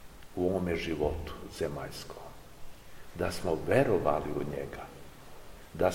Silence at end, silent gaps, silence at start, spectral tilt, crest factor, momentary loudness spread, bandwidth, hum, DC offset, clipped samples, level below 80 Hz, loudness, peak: 0 s; none; 0 s; -6 dB/octave; 22 dB; 24 LU; 16.5 kHz; none; 0.2%; under 0.1%; -48 dBFS; -32 LUFS; -12 dBFS